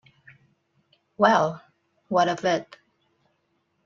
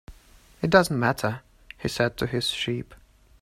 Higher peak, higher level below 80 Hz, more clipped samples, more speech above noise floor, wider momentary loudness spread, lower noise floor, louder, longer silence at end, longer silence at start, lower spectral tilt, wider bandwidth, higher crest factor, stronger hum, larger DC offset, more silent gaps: about the same, -4 dBFS vs -2 dBFS; second, -72 dBFS vs -50 dBFS; neither; first, 50 dB vs 29 dB; second, 9 LU vs 14 LU; first, -72 dBFS vs -54 dBFS; about the same, -23 LUFS vs -25 LUFS; first, 1.25 s vs 0.45 s; first, 1.2 s vs 0.1 s; about the same, -5 dB/octave vs -5 dB/octave; second, 7.4 kHz vs 16 kHz; about the same, 22 dB vs 24 dB; neither; neither; neither